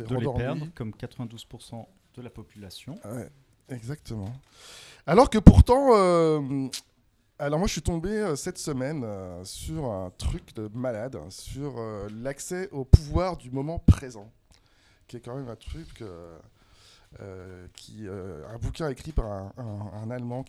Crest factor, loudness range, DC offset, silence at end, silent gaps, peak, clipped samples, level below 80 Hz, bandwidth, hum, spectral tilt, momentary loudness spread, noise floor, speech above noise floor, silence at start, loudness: 26 dB; 20 LU; under 0.1%; 0.05 s; none; 0 dBFS; under 0.1%; -34 dBFS; 14 kHz; none; -7 dB/octave; 24 LU; -61 dBFS; 35 dB; 0 s; -25 LUFS